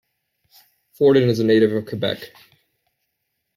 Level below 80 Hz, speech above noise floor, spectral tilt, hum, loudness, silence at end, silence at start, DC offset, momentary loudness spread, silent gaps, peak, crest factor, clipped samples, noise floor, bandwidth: -64 dBFS; 58 dB; -7 dB/octave; none; -18 LUFS; 1.3 s; 1 s; under 0.1%; 13 LU; none; -4 dBFS; 18 dB; under 0.1%; -76 dBFS; 15 kHz